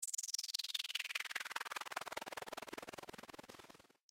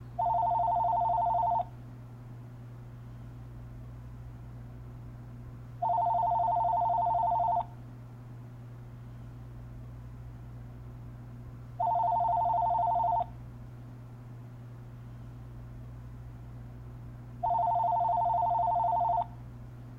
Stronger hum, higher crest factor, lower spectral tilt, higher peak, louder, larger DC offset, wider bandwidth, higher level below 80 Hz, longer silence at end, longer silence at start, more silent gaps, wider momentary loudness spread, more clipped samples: second, none vs 60 Hz at -45 dBFS; first, 22 dB vs 12 dB; second, 0.5 dB/octave vs -9 dB/octave; second, -24 dBFS vs -20 dBFS; second, -43 LUFS vs -29 LUFS; neither; first, 17 kHz vs 5.2 kHz; second, -82 dBFS vs -52 dBFS; first, 0.35 s vs 0 s; about the same, 0 s vs 0 s; neither; second, 16 LU vs 19 LU; neither